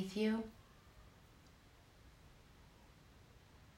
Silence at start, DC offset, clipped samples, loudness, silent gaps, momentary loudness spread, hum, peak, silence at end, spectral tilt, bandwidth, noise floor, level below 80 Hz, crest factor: 0 s; under 0.1%; under 0.1%; -40 LUFS; none; 26 LU; none; -26 dBFS; 0.05 s; -6 dB/octave; 16 kHz; -64 dBFS; -68 dBFS; 20 dB